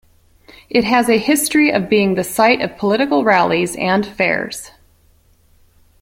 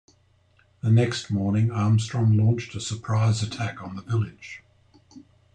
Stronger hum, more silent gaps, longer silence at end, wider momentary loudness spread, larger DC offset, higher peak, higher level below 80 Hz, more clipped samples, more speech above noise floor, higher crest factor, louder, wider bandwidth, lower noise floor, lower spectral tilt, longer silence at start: neither; neither; first, 1.35 s vs 0.35 s; second, 4 LU vs 12 LU; neither; first, 0 dBFS vs -10 dBFS; first, -52 dBFS vs -60 dBFS; neither; about the same, 38 dB vs 38 dB; about the same, 16 dB vs 14 dB; first, -15 LUFS vs -24 LUFS; first, 16.5 kHz vs 9.4 kHz; second, -53 dBFS vs -61 dBFS; second, -4 dB/octave vs -6.5 dB/octave; second, 0.7 s vs 0.85 s